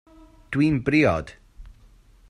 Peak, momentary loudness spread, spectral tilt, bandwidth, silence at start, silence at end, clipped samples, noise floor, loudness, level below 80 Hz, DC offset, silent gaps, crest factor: -8 dBFS; 11 LU; -7.5 dB/octave; 10.5 kHz; 0.5 s; 0.6 s; under 0.1%; -53 dBFS; -22 LUFS; -46 dBFS; under 0.1%; none; 18 dB